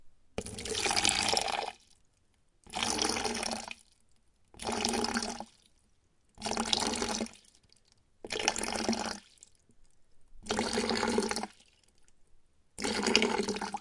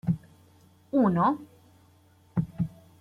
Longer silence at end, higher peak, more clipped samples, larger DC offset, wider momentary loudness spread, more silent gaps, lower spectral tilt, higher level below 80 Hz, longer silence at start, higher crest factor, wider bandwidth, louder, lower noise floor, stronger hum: second, 0 s vs 0.3 s; first, -4 dBFS vs -12 dBFS; neither; neither; first, 17 LU vs 11 LU; neither; second, -2 dB/octave vs -10 dB/octave; about the same, -58 dBFS vs -58 dBFS; about the same, 0 s vs 0.05 s; first, 30 dB vs 18 dB; first, 11.5 kHz vs 5.2 kHz; second, -32 LUFS vs -28 LUFS; first, -69 dBFS vs -60 dBFS; neither